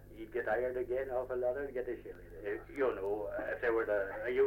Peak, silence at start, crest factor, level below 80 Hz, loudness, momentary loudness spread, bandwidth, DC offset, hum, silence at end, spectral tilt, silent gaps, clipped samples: -20 dBFS; 0 s; 16 dB; -58 dBFS; -37 LUFS; 9 LU; 16.5 kHz; under 0.1%; 50 Hz at -60 dBFS; 0 s; -7 dB/octave; none; under 0.1%